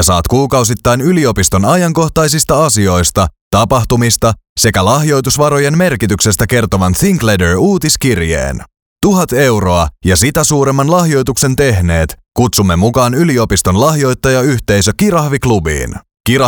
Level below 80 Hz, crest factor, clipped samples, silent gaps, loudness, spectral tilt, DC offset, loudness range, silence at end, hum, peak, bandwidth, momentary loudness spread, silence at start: -28 dBFS; 10 dB; under 0.1%; 3.41-3.51 s, 4.49-4.56 s, 8.82-8.96 s; -11 LUFS; -4.5 dB/octave; under 0.1%; 1 LU; 0 s; none; 0 dBFS; over 20 kHz; 4 LU; 0 s